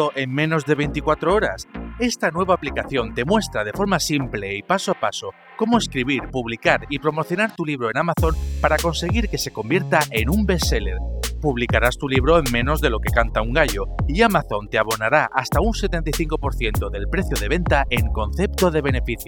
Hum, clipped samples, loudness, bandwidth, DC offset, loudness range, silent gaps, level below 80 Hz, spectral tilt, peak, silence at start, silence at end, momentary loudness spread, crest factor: none; under 0.1%; -21 LUFS; over 20 kHz; under 0.1%; 3 LU; none; -28 dBFS; -5 dB/octave; 0 dBFS; 0 s; 0 s; 6 LU; 20 dB